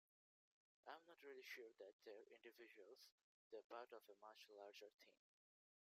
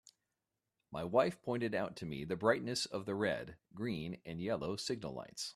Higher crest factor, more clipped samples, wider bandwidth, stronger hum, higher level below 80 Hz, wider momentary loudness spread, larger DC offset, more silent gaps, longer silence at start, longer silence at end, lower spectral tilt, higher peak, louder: about the same, 22 dB vs 22 dB; neither; first, 15.5 kHz vs 14 kHz; neither; second, under -90 dBFS vs -68 dBFS; second, 8 LU vs 11 LU; neither; first, 1.93-1.99 s, 3.12-3.51 s, 3.64-3.70 s, 4.94-4.98 s vs none; about the same, 0.85 s vs 0.9 s; first, 0.75 s vs 0.05 s; second, -1.5 dB/octave vs -4.5 dB/octave; second, -42 dBFS vs -16 dBFS; second, -63 LUFS vs -38 LUFS